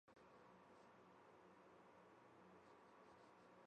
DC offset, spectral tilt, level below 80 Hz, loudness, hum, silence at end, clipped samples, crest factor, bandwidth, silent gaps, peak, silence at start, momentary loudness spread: under 0.1%; -5.5 dB/octave; under -90 dBFS; -68 LUFS; none; 0 s; under 0.1%; 12 dB; 8.8 kHz; none; -56 dBFS; 0.05 s; 1 LU